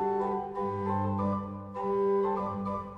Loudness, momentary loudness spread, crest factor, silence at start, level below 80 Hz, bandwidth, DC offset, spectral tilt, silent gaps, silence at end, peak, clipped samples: -31 LUFS; 7 LU; 12 dB; 0 s; -60 dBFS; 5.6 kHz; under 0.1%; -10 dB/octave; none; 0 s; -18 dBFS; under 0.1%